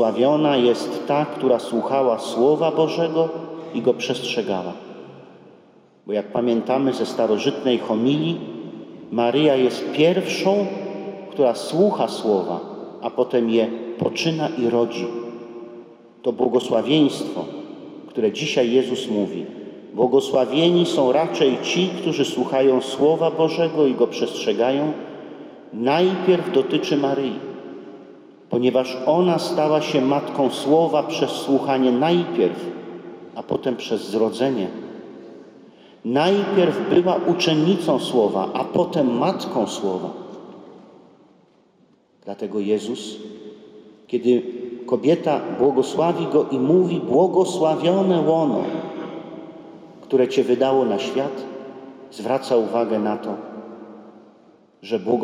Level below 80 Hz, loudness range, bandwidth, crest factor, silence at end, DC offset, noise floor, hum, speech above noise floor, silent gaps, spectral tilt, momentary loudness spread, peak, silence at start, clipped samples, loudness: -72 dBFS; 6 LU; 14 kHz; 16 dB; 0 s; under 0.1%; -58 dBFS; none; 38 dB; none; -6 dB/octave; 18 LU; -6 dBFS; 0 s; under 0.1%; -20 LUFS